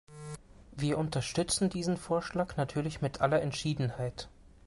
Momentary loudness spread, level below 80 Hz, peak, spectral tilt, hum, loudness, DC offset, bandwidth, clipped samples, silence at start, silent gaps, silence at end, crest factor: 17 LU; -54 dBFS; -14 dBFS; -5 dB/octave; none; -32 LUFS; under 0.1%; 11.5 kHz; under 0.1%; 0.1 s; none; 0.2 s; 18 dB